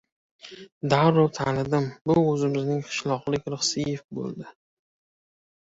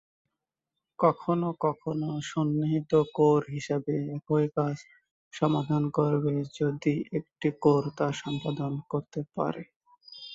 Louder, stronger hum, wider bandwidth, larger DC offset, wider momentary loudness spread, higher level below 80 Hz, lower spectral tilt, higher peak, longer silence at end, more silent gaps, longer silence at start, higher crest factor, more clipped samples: first, -25 LUFS vs -28 LUFS; neither; about the same, 8 kHz vs 8 kHz; neither; first, 19 LU vs 9 LU; first, -58 dBFS vs -68 dBFS; second, -5.5 dB/octave vs -7.5 dB/octave; first, -6 dBFS vs -10 dBFS; first, 1.25 s vs 0 s; second, 0.72-0.81 s, 2.01-2.05 s, 4.04-4.09 s vs 5.11-5.31 s, 9.76-9.80 s; second, 0.45 s vs 1 s; about the same, 20 dB vs 20 dB; neither